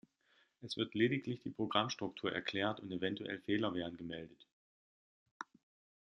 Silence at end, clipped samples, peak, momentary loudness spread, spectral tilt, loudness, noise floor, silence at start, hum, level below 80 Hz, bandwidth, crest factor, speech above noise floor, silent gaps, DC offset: 0.6 s; under 0.1%; -16 dBFS; 18 LU; -5.5 dB/octave; -39 LUFS; -75 dBFS; 0.6 s; none; -76 dBFS; 9.8 kHz; 24 dB; 36 dB; 4.52-5.40 s; under 0.1%